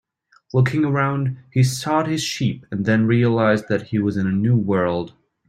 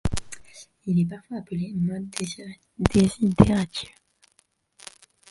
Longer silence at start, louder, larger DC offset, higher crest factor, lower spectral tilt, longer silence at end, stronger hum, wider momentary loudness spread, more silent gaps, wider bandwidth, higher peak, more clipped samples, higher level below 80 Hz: first, 0.55 s vs 0.05 s; first, -20 LUFS vs -24 LUFS; neither; second, 16 dB vs 26 dB; about the same, -6.5 dB/octave vs -6.5 dB/octave; second, 0.4 s vs 1.45 s; neither; second, 7 LU vs 23 LU; neither; first, 14 kHz vs 11.5 kHz; second, -4 dBFS vs 0 dBFS; neither; second, -54 dBFS vs -40 dBFS